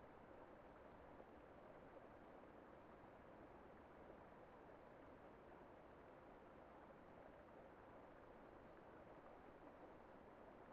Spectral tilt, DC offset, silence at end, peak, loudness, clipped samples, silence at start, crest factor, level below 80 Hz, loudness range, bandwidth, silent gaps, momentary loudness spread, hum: -5.5 dB/octave; under 0.1%; 0 s; -48 dBFS; -64 LUFS; under 0.1%; 0 s; 16 dB; -76 dBFS; 0 LU; 4.9 kHz; none; 1 LU; none